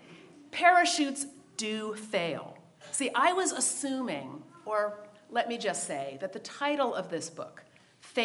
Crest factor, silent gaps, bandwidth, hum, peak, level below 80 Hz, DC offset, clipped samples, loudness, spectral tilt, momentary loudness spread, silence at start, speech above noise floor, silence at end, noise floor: 24 dB; none; 11.5 kHz; none; -8 dBFS; -86 dBFS; under 0.1%; under 0.1%; -30 LUFS; -2 dB/octave; 15 LU; 0.05 s; 27 dB; 0 s; -57 dBFS